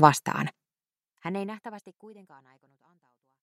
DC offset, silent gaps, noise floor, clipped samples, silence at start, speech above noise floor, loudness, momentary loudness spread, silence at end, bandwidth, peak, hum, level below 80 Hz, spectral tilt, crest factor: under 0.1%; none; under -90 dBFS; under 0.1%; 0 s; over 62 dB; -30 LUFS; 23 LU; 1.3 s; 15.5 kHz; -2 dBFS; none; -68 dBFS; -5 dB/octave; 28 dB